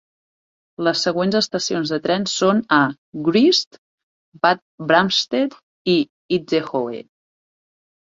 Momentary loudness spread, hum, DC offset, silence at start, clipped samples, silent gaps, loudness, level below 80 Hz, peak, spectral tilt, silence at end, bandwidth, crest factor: 9 LU; none; under 0.1%; 0.8 s; under 0.1%; 2.98-3.12 s, 3.67-3.71 s, 3.78-4.32 s, 4.62-4.78 s, 5.63-5.85 s, 6.10-6.29 s; -19 LUFS; -62 dBFS; -2 dBFS; -4 dB/octave; 1 s; 7.8 kHz; 20 dB